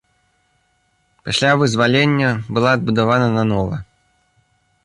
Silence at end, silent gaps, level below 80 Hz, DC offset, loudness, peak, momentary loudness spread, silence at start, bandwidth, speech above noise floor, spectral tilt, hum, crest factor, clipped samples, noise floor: 1 s; none; -46 dBFS; under 0.1%; -16 LUFS; -2 dBFS; 8 LU; 1.25 s; 11.5 kHz; 47 dB; -5.5 dB/octave; none; 16 dB; under 0.1%; -63 dBFS